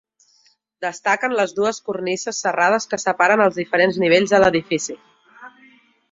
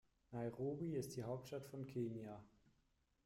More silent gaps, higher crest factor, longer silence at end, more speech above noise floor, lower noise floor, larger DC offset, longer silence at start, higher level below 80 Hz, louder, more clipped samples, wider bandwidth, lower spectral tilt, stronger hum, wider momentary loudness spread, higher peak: neither; about the same, 18 dB vs 14 dB; about the same, 0.65 s vs 0.75 s; first, 41 dB vs 34 dB; second, -60 dBFS vs -81 dBFS; neither; first, 0.8 s vs 0.3 s; first, -58 dBFS vs -76 dBFS; first, -19 LUFS vs -48 LUFS; neither; second, 7.8 kHz vs 16 kHz; second, -3.5 dB/octave vs -7 dB/octave; neither; about the same, 10 LU vs 9 LU; first, -2 dBFS vs -34 dBFS